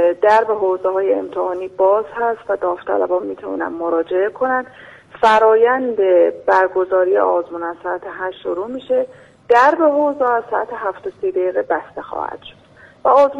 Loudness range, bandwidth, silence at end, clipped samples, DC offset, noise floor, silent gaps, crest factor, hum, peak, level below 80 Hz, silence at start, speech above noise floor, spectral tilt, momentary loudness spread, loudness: 4 LU; 10 kHz; 0 s; under 0.1%; under 0.1%; -46 dBFS; none; 14 dB; none; -2 dBFS; -58 dBFS; 0 s; 29 dB; -5.5 dB/octave; 13 LU; -17 LUFS